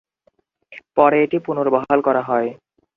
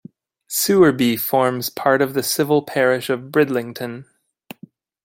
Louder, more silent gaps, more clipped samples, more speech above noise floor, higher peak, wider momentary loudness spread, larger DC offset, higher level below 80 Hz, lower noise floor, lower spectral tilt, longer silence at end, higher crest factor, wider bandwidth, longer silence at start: about the same, -18 LUFS vs -18 LUFS; neither; neither; first, 46 dB vs 28 dB; about the same, 0 dBFS vs -2 dBFS; second, 7 LU vs 12 LU; neither; about the same, -62 dBFS vs -60 dBFS; first, -63 dBFS vs -46 dBFS; first, -9 dB/octave vs -4.5 dB/octave; second, 0.4 s vs 1 s; about the same, 20 dB vs 18 dB; second, 4.6 kHz vs 17 kHz; first, 0.7 s vs 0.5 s